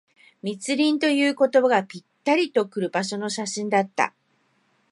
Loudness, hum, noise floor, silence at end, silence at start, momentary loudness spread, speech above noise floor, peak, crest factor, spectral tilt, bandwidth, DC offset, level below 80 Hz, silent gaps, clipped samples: -23 LUFS; none; -67 dBFS; 0.8 s; 0.45 s; 11 LU; 44 dB; -4 dBFS; 18 dB; -4 dB/octave; 11.5 kHz; under 0.1%; -78 dBFS; none; under 0.1%